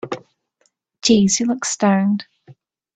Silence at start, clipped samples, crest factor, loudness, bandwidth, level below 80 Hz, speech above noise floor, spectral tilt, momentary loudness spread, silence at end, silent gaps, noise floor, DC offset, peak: 0.05 s; under 0.1%; 18 dB; -17 LUFS; 9.2 kHz; -56 dBFS; 49 dB; -4 dB/octave; 13 LU; 0.45 s; none; -66 dBFS; under 0.1%; -2 dBFS